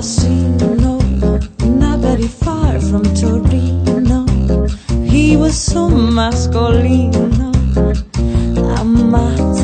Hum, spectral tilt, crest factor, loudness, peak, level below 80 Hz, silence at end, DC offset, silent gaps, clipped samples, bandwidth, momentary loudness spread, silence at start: none; -6.5 dB/octave; 12 dB; -14 LUFS; 0 dBFS; -18 dBFS; 0 s; under 0.1%; none; under 0.1%; 9.2 kHz; 5 LU; 0 s